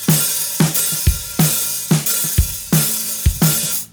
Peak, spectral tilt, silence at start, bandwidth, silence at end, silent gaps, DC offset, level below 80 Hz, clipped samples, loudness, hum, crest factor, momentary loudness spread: -2 dBFS; -3.5 dB/octave; 0 s; over 20 kHz; 0.05 s; none; under 0.1%; -28 dBFS; under 0.1%; -16 LUFS; none; 16 dB; 3 LU